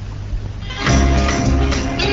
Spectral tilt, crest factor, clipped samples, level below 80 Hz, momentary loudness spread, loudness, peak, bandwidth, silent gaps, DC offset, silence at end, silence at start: -5 dB/octave; 14 dB; under 0.1%; -20 dBFS; 13 LU; -18 LUFS; -2 dBFS; 7.8 kHz; none; 0.7%; 0 s; 0 s